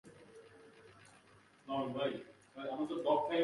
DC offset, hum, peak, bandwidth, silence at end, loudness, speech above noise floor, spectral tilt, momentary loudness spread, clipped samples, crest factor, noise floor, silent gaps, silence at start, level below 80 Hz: under 0.1%; none; -20 dBFS; 11.5 kHz; 0 s; -38 LUFS; 29 dB; -6 dB/octave; 25 LU; under 0.1%; 20 dB; -65 dBFS; none; 0.05 s; -80 dBFS